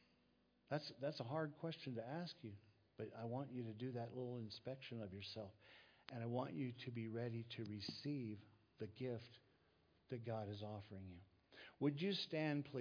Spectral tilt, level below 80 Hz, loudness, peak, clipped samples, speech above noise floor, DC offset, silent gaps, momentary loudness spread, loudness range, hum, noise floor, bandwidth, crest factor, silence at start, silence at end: -5.5 dB/octave; -86 dBFS; -49 LUFS; -28 dBFS; under 0.1%; 31 dB; under 0.1%; none; 15 LU; 3 LU; none; -79 dBFS; 5.4 kHz; 20 dB; 0.7 s; 0 s